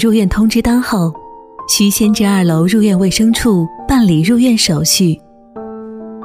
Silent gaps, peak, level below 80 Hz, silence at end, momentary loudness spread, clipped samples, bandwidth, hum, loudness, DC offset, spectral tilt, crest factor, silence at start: none; 0 dBFS; -32 dBFS; 0 s; 17 LU; under 0.1%; 16 kHz; none; -12 LUFS; under 0.1%; -4.5 dB/octave; 12 dB; 0 s